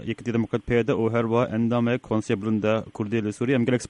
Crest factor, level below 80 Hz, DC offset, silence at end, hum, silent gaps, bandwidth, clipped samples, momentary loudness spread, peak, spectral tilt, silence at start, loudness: 14 dB; -50 dBFS; under 0.1%; 0.05 s; none; none; 10.5 kHz; under 0.1%; 4 LU; -8 dBFS; -7 dB/octave; 0 s; -24 LUFS